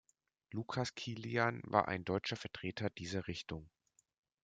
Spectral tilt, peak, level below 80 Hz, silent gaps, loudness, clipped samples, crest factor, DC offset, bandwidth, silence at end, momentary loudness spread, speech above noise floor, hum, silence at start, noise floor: -5.5 dB/octave; -14 dBFS; -70 dBFS; none; -39 LUFS; under 0.1%; 28 dB; under 0.1%; 9.2 kHz; 0.75 s; 11 LU; 31 dB; none; 0.5 s; -70 dBFS